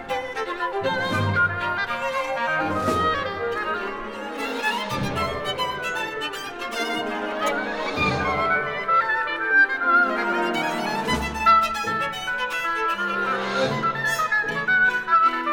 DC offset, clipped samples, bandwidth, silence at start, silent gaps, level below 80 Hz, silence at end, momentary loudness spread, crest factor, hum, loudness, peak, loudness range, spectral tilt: under 0.1%; under 0.1%; 19 kHz; 0 s; none; -48 dBFS; 0 s; 9 LU; 16 dB; none; -23 LUFS; -8 dBFS; 6 LU; -4 dB/octave